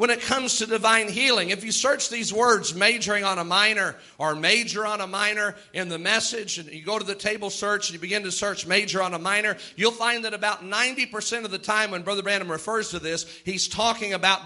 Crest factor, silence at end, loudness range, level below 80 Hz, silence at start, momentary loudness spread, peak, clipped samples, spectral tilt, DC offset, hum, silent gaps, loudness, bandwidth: 22 dB; 0 s; 4 LU; -64 dBFS; 0 s; 9 LU; -2 dBFS; under 0.1%; -1.5 dB/octave; under 0.1%; none; none; -23 LUFS; 12 kHz